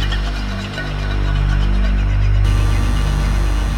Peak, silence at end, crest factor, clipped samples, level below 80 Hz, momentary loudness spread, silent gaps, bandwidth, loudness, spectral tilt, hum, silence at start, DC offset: -4 dBFS; 0 s; 12 dB; under 0.1%; -16 dBFS; 7 LU; none; 11.5 kHz; -19 LUFS; -6 dB/octave; 50 Hz at -20 dBFS; 0 s; under 0.1%